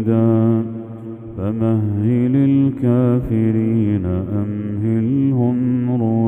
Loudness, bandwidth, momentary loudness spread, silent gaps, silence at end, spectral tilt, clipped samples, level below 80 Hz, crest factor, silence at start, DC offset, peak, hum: -17 LUFS; 3.6 kHz; 9 LU; none; 0 s; -12 dB/octave; under 0.1%; -44 dBFS; 14 dB; 0 s; under 0.1%; -2 dBFS; none